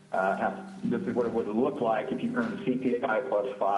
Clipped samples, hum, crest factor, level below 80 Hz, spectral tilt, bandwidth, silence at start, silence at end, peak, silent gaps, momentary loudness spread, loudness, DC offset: under 0.1%; none; 14 dB; -68 dBFS; -7.5 dB/octave; 11.5 kHz; 0.1 s; 0 s; -14 dBFS; none; 4 LU; -29 LUFS; under 0.1%